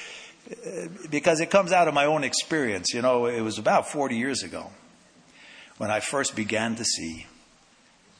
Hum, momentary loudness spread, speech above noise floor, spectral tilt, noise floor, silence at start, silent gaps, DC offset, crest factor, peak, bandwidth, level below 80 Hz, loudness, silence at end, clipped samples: none; 18 LU; 33 dB; -3 dB/octave; -58 dBFS; 0 s; none; under 0.1%; 20 dB; -6 dBFS; 10.5 kHz; -64 dBFS; -25 LUFS; 0.9 s; under 0.1%